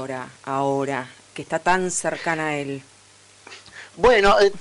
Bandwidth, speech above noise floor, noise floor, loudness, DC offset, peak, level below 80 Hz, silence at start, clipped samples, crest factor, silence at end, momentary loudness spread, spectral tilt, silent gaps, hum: 11 kHz; 30 dB; -51 dBFS; -21 LUFS; under 0.1%; -8 dBFS; -44 dBFS; 0 s; under 0.1%; 14 dB; 0 s; 24 LU; -3.5 dB/octave; none; none